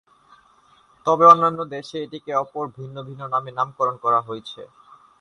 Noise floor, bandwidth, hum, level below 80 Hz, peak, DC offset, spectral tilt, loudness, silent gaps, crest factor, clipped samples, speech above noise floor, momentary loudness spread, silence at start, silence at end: -56 dBFS; 10.5 kHz; none; -66 dBFS; 0 dBFS; under 0.1%; -6 dB/octave; -20 LUFS; none; 22 dB; under 0.1%; 35 dB; 22 LU; 1.05 s; 0.55 s